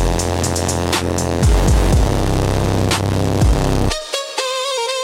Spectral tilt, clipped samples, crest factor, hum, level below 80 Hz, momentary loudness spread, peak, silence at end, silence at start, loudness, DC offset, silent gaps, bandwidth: -5 dB/octave; under 0.1%; 14 dB; none; -20 dBFS; 5 LU; -2 dBFS; 0 s; 0 s; -17 LUFS; under 0.1%; none; 16.5 kHz